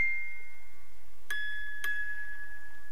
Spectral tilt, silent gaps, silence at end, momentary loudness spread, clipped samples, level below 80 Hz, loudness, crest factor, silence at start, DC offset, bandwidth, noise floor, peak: -1.5 dB/octave; none; 0 s; 16 LU; under 0.1%; -60 dBFS; -37 LUFS; 18 dB; 0 s; 4%; 16.5 kHz; -59 dBFS; -18 dBFS